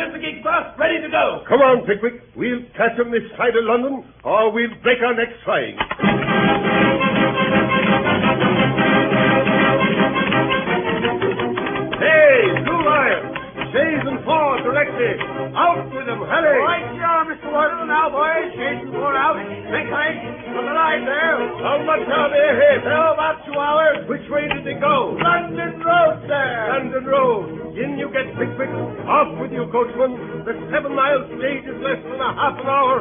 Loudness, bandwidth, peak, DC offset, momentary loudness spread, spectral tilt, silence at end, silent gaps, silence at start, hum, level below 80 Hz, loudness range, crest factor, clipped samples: -18 LUFS; 3.7 kHz; -2 dBFS; under 0.1%; 9 LU; -11 dB/octave; 0 s; none; 0 s; none; -50 dBFS; 5 LU; 16 dB; under 0.1%